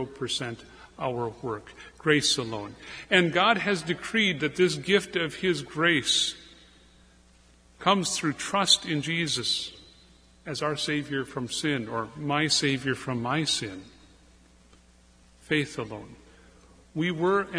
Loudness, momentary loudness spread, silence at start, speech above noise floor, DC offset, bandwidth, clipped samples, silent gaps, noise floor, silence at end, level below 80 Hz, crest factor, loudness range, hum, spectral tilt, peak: -26 LUFS; 15 LU; 0 s; 30 dB; under 0.1%; 11 kHz; under 0.1%; none; -58 dBFS; 0 s; -60 dBFS; 24 dB; 7 LU; none; -3.5 dB/octave; -6 dBFS